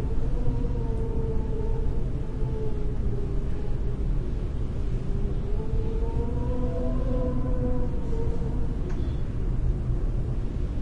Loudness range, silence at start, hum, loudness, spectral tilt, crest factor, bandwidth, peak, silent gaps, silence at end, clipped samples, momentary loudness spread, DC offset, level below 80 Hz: 2 LU; 0 s; none; -30 LUFS; -9.5 dB/octave; 14 dB; 5 kHz; -12 dBFS; none; 0 s; under 0.1%; 3 LU; under 0.1%; -28 dBFS